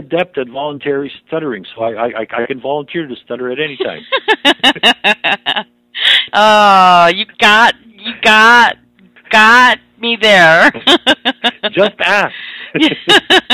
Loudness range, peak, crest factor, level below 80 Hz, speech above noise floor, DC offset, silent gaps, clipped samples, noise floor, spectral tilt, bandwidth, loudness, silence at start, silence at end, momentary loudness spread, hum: 11 LU; 0 dBFS; 12 dB; -52 dBFS; 33 dB; under 0.1%; none; 0.3%; -44 dBFS; -3 dB/octave; 16 kHz; -10 LUFS; 0 s; 0 s; 15 LU; none